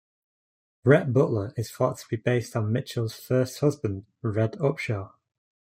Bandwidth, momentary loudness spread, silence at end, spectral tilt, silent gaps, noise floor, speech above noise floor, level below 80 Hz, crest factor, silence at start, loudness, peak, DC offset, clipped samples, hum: 16 kHz; 11 LU; 0.55 s; -7 dB/octave; none; under -90 dBFS; over 65 dB; -64 dBFS; 22 dB; 0.85 s; -26 LUFS; -6 dBFS; under 0.1%; under 0.1%; none